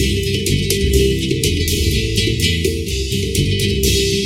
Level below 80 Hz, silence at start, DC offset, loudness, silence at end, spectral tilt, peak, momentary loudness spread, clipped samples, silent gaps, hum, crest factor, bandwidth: -24 dBFS; 0 s; under 0.1%; -17 LUFS; 0 s; -4 dB/octave; 0 dBFS; 4 LU; under 0.1%; none; none; 16 dB; 17 kHz